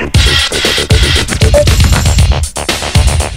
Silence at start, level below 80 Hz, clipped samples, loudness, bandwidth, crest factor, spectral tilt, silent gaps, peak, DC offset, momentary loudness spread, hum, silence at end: 0 s; -12 dBFS; 0.8%; -9 LUFS; 16.5 kHz; 8 dB; -4 dB/octave; none; 0 dBFS; under 0.1%; 4 LU; none; 0 s